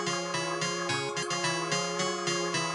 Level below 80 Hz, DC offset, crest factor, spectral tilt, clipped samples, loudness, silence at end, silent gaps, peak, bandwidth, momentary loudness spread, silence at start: -72 dBFS; under 0.1%; 16 dB; -2.5 dB/octave; under 0.1%; -30 LUFS; 0 s; none; -16 dBFS; 11.5 kHz; 2 LU; 0 s